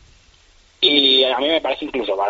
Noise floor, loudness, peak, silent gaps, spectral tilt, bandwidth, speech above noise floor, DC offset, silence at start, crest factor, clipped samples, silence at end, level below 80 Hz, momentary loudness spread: -52 dBFS; -15 LUFS; -2 dBFS; none; 1 dB/octave; 8 kHz; 32 dB; under 0.1%; 0.8 s; 18 dB; under 0.1%; 0 s; -52 dBFS; 11 LU